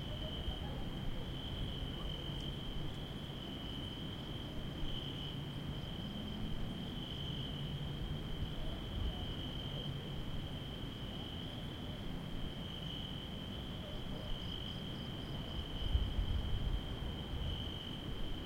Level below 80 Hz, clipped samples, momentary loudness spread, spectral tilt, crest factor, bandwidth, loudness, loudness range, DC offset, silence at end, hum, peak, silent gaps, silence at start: -46 dBFS; under 0.1%; 4 LU; -6 dB/octave; 20 dB; 16.5 kHz; -43 LUFS; 3 LU; under 0.1%; 0 s; none; -20 dBFS; none; 0 s